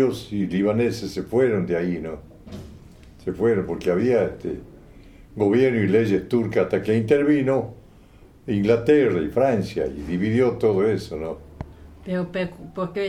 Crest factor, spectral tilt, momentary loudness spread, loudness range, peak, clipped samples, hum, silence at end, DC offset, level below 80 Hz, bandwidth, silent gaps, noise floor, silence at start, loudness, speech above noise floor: 18 dB; -7.5 dB/octave; 18 LU; 4 LU; -6 dBFS; under 0.1%; none; 0 s; under 0.1%; -48 dBFS; 13.5 kHz; none; -49 dBFS; 0 s; -22 LUFS; 28 dB